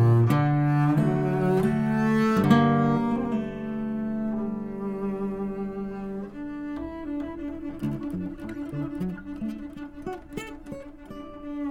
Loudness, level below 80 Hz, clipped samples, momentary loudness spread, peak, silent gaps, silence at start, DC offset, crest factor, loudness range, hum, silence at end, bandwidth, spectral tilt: -27 LUFS; -50 dBFS; under 0.1%; 16 LU; -6 dBFS; none; 0 s; under 0.1%; 20 dB; 11 LU; none; 0 s; 16 kHz; -8.5 dB/octave